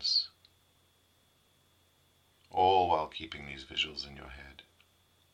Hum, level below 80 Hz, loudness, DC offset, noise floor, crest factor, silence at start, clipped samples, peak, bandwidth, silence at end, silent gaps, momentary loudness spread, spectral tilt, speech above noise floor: none; -62 dBFS; -32 LUFS; under 0.1%; -69 dBFS; 20 dB; 0 s; under 0.1%; -14 dBFS; 14.5 kHz; 0.7 s; none; 22 LU; -3 dB/octave; 31 dB